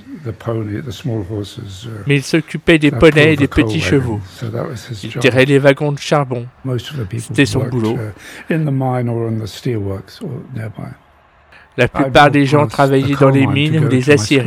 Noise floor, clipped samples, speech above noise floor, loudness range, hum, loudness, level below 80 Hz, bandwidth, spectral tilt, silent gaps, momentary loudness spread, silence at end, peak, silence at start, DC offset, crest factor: -49 dBFS; 0.2%; 34 dB; 8 LU; none; -14 LUFS; -38 dBFS; 15 kHz; -6 dB/octave; none; 17 LU; 0 s; 0 dBFS; 0.05 s; under 0.1%; 14 dB